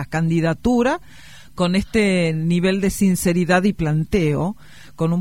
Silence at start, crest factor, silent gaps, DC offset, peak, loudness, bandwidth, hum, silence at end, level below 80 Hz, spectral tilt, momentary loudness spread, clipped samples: 0 s; 16 dB; none; 0.8%; -2 dBFS; -19 LUFS; 16 kHz; none; 0 s; -40 dBFS; -6 dB/octave; 7 LU; under 0.1%